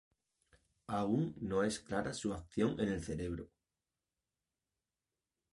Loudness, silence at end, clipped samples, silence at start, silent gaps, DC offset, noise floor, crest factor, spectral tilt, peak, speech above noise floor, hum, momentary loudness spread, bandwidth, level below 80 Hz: -38 LUFS; 2.1 s; under 0.1%; 0.9 s; none; under 0.1%; under -90 dBFS; 20 dB; -6 dB/octave; -20 dBFS; over 53 dB; none; 7 LU; 11.5 kHz; -60 dBFS